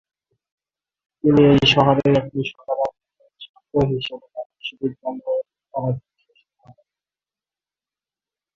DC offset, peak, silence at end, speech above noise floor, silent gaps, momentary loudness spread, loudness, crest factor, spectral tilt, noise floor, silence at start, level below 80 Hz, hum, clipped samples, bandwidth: under 0.1%; -2 dBFS; 2.55 s; over 72 dB; 3.49-3.54 s, 4.46-4.50 s; 17 LU; -20 LUFS; 20 dB; -7 dB/octave; under -90 dBFS; 1.25 s; -48 dBFS; none; under 0.1%; 7.4 kHz